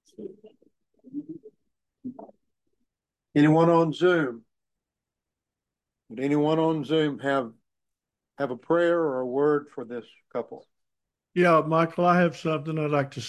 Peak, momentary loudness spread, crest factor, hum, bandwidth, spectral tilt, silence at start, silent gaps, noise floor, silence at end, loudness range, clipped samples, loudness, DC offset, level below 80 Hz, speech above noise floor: -8 dBFS; 21 LU; 18 dB; none; 11 kHz; -7.5 dB/octave; 0.2 s; none; -88 dBFS; 0 s; 3 LU; under 0.1%; -24 LUFS; under 0.1%; -72 dBFS; 64 dB